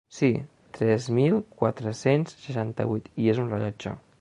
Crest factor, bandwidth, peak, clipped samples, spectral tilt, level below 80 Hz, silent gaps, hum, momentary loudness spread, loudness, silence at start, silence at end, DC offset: 18 dB; 10.5 kHz; -8 dBFS; under 0.1%; -7.5 dB/octave; -60 dBFS; none; none; 9 LU; -26 LUFS; 0.1 s; 0.2 s; under 0.1%